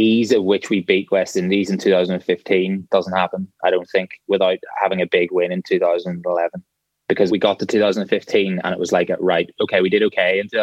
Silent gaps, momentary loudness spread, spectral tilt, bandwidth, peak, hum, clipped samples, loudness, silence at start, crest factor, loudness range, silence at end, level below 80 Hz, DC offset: none; 6 LU; -5.5 dB/octave; 12.5 kHz; -2 dBFS; none; under 0.1%; -19 LUFS; 0 s; 16 dB; 2 LU; 0 s; -66 dBFS; under 0.1%